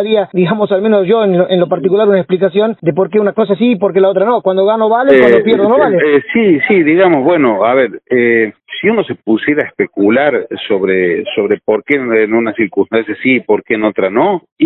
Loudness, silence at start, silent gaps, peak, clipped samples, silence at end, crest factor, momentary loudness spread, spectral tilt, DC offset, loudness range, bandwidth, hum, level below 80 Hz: -11 LUFS; 0 s; 14.52-14.56 s; 0 dBFS; under 0.1%; 0 s; 10 dB; 6 LU; -9 dB/octave; under 0.1%; 4 LU; 4.1 kHz; none; -54 dBFS